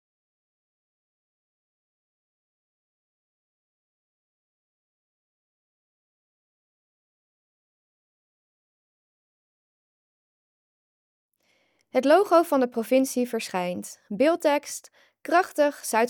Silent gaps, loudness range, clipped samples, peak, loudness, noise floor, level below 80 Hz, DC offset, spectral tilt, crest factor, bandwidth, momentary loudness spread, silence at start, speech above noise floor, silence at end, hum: none; 3 LU; under 0.1%; -6 dBFS; -23 LUFS; -69 dBFS; -88 dBFS; under 0.1%; -4 dB/octave; 22 dB; over 20 kHz; 16 LU; 11.95 s; 46 dB; 0 s; none